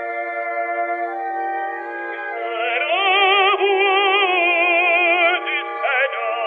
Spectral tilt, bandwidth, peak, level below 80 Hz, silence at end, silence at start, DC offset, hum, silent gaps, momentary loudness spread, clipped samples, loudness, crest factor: -2.5 dB/octave; 4.7 kHz; -6 dBFS; -82 dBFS; 0 s; 0 s; under 0.1%; none; none; 11 LU; under 0.1%; -18 LUFS; 14 dB